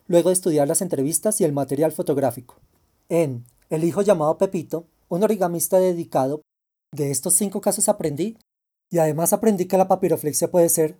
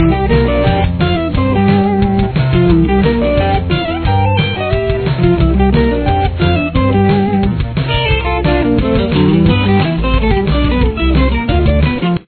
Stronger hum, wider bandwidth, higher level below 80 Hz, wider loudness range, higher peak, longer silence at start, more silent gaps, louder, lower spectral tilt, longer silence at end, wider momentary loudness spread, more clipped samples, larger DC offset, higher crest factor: neither; first, over 20 kHz vs 4.5 kHz; second, -64 dBFS vs -18 dBFS; about the same, 3 LU vs 1 LU; second, -4 dBFS vs 0 dBFS; about the same, 0.1 s vs 0 s; neither; second, -21 LUFS vs -13 LUFS; second, -5 dB/octave vs -11 dB/octave; about the same, 0.05 s vs 0.05 s; first, 10 LU vs 4 LU; neither; neither; first, 18 dB vs 12 dB